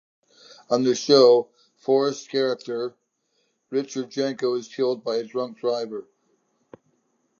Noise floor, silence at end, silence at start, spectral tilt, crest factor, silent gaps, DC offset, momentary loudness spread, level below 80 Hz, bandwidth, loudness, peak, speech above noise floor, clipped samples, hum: -71 dBFS; 1.4 s; 0.7 s; -4.5 dB/octave; 22 dB; none; under 0.1%; 14 LU; -82 dBFS; 7.2 kHz; -23 LUFS; -4 dBFS; 49 dB; under 0.1%; none